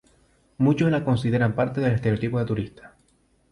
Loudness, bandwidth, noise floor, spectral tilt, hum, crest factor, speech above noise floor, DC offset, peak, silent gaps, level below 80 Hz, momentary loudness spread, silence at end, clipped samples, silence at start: -23 LUFS; 11 kHz; -63 dBFS; -8.5 dB/octave; none; 14 dB; 41 dB; under 0.1%; -10 dBFS; none; -50 dBFS; 6 LU; 0.65 s; under 0.1%; 0.6 s